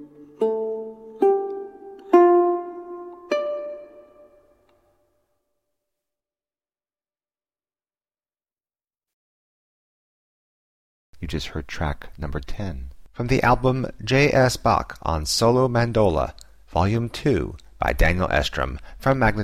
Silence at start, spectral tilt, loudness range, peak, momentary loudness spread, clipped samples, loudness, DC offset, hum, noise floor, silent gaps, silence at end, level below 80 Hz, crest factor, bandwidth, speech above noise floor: 0 s; -5.5 dB/octave; 14 LU; -2 dBFS; 17 LU; under 0.1%; -22 LUFS; under 0.1%; none; under -90 dBFS; 9.13-11.13 s; 0 s; -36 dBFS; 22 dB; 15 kHz; over 69 dB